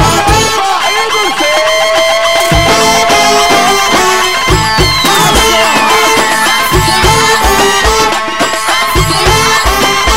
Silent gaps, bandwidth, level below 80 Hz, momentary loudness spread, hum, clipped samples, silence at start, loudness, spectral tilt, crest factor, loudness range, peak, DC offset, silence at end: none; 16.5 kHz; -22 dBFS; 3 LU; none; under 0.1%; 0 s; -7 LUFS; -2.5 dB/octave; 8 dB; 1 LU; 0 dBFS; 4%; 0 s